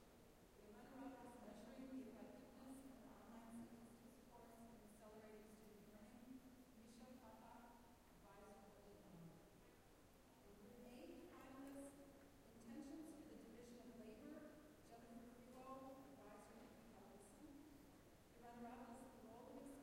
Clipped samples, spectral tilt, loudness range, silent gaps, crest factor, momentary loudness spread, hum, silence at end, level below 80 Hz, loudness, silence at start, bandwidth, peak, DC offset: under 0.1%; -5.5 dB/octave; 5 LU; none; 18 dB; 8 LU; none; 0 s; -76 dBFS; -63 LUFS; 0 s; 16 kHz; -44 dBFS; under 0.1%